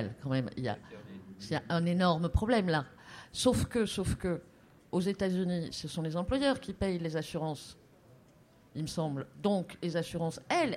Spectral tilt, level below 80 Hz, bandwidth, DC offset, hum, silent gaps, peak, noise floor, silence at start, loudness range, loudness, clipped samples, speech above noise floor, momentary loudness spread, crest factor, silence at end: -6 dB/octave; -48 dBFS; 15 kHz; under 0.1%; none; none; -14 dBFS; -61 dBFS; 0 s; 5 LU; -33 LUFS; under 0.1%; 29 dB; 14 LU; 20 dB; 0 s